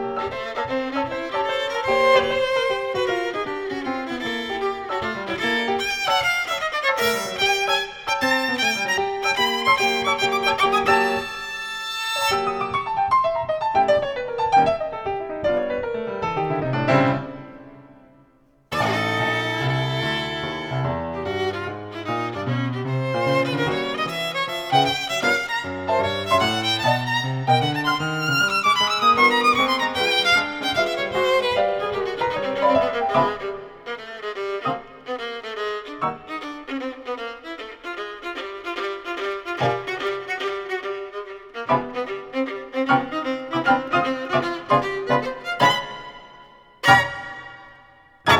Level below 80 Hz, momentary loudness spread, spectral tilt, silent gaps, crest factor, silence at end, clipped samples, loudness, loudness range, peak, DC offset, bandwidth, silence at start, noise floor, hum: -54 dBFS; 12 LU; -4 dB/octave; none; 22 dB; 0 s; under 0.1%; -22 LUFS; 8 LU; 0 dBFS; under 0.1%; 20 kHz; 0 s; -57 dBFS; none